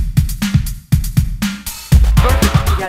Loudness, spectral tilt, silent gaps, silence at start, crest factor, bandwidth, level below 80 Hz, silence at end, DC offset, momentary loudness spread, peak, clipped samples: -15 LUFS; -5.5 dB/octave; none; 0 s; 14 dB; 16.5 kHz; -16 dBFS; 0 s; under 0.1%; 8 LU; 0 dBFS; under 0.1%